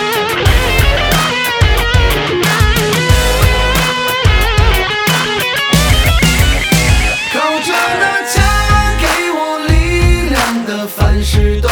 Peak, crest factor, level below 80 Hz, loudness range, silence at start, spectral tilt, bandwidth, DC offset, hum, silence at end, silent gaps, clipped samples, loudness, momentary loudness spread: 0 dBFS; 12 dB; -16 dBFS; 1 LU; 0 s; -4 dB/octave; over 20 kHz; under 0.1%; none; 0 s; none; under 0.1%; -12 LUFS; 3 LU